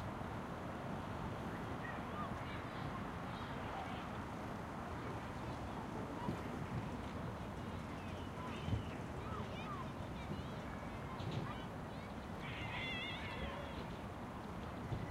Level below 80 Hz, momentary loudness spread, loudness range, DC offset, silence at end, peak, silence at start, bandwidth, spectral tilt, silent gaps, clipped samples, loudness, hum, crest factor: -56 dBFS; 4 LU; 1 LU; under 0.1%; 0 s; -28 dBFS; 0 s; 16 kHz; -6.5 dB/octave; none; under 0.1%; -45 LUFS; none; 18 dB